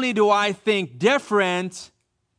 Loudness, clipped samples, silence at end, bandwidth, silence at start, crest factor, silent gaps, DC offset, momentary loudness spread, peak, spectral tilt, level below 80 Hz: -21 LUFS; under 0.1%; 0.55 s; 10.5 kHz; 0 s; 16 dB; none; under 0.1%; 10 LU; -6 dBFS; -4.5 dB/octave; -70 dBFS